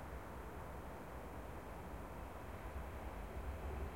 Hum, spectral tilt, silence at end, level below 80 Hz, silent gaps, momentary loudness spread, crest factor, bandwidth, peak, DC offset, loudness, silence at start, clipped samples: none; -6.5 dB/octave; 0 s; -52 dBFS; none; 3 LU; 14 dB; 16.5 kHz; -34 dBFS; under 0.1%; -50 LUFS; 0 s; under 0.1%